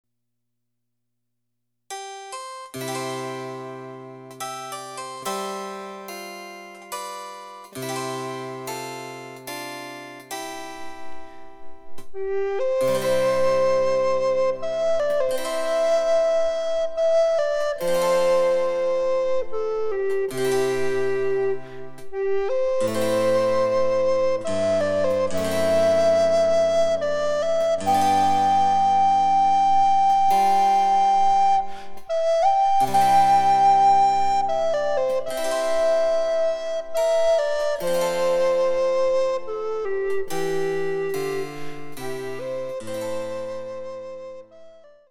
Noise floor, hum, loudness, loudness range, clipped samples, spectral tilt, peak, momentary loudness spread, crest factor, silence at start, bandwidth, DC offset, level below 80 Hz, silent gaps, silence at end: -81 dBFS; none; -22 LUFS; 14 LU; under 0.1%; -4 dB/octave; -8 dBFS; 17 LU; 14 dB; 1.9 s; 17 kHz; under 0.1%; -56 dBFS; none; 0.4 s